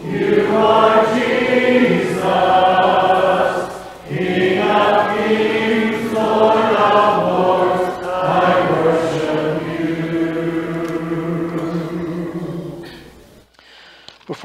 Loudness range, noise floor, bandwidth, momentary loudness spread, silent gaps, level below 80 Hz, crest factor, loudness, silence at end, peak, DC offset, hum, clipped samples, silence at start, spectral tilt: 9 LU; -46 dBFS; 15.5 kHz; 11 LU; none; -50 dBFS; 16 dB; -16 LUFS; 0 s; 0 dBFS; under 0.1%; none; under 0.1%; 0 s; -6 dB/octave